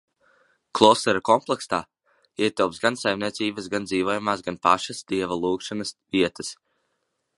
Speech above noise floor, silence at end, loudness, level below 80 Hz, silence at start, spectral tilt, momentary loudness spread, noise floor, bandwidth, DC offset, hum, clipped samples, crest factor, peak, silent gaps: 52 dB; 0.85 s; -24 LUFS; -60 dBFS; 0.75 s; -4 dB/octave; 11 LU; -76 dBFS; 11.5 kHz; under 0.1%; none; under 0.1%; 24 dB; 0 dBFS; none